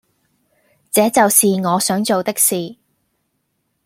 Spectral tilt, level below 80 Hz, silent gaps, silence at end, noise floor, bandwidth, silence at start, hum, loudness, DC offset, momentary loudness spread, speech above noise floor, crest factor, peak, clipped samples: -3.5 dB/octave; -64 dBFS; none; 1.1 s; -69 dBFS; 16.5 kHz; 0.95 s; none; -15 LUFS; under 0.1%; 8 LU; 54 dB; 18 dB; 0 dBFS; under 0.1%